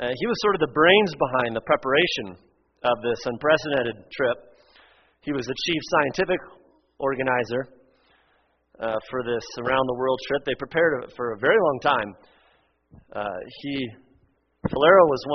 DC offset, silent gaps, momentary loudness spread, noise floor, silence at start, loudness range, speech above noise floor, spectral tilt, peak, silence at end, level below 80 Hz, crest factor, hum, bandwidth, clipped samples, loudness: under 0.1%; none; 15 LU; -66 dBFS; 0 s; 6 LU; 43 dB; -2.5 dB/octave; -2 dBFS; 0 s; -56 dBFS; 22 dB; none; 6.4 kHz; under 0.1%; -23 LUFS